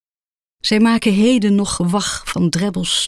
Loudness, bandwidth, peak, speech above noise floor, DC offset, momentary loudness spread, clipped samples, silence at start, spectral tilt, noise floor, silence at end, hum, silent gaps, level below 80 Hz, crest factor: -16 LUFS; 13.5 kHz; -4 dBFS; over 74 dB; under 0.1%; 6 LU; under 0.1%; 0.65 s; -4.5 dB/octave; under -90 dBFS; 0 s; none; none; -44 dBFS; 12 dB